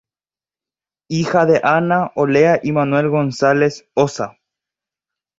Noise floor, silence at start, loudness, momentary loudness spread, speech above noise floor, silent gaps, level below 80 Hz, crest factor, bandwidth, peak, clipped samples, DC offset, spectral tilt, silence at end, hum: under -90 dBFS; 1.1 s; -16 LUFS; 7 LU; over 75 dB; none; -58 dBFS; 16 dB; 7.8 kHz; -2 dBFS; under 0.1%; under 0.1%; -6.5 dB/octave; 1.1 s; none